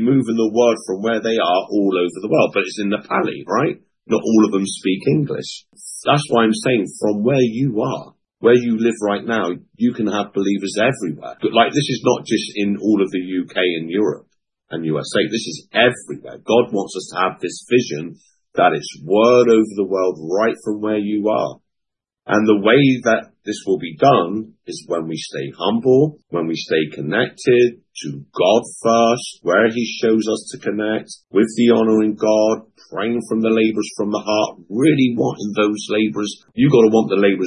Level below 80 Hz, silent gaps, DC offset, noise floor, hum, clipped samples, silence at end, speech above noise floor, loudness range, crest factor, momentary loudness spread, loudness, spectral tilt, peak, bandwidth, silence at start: -64 dBFS; none; under 0.1%; -80 dBFS; none; under 0.1%; 0 s; 63 dB; 3 LU; 18 dB; 11 LU; -18 LUFS; -5.5 dB/octave; 0 dBFS; 11.5 kHz; 0 s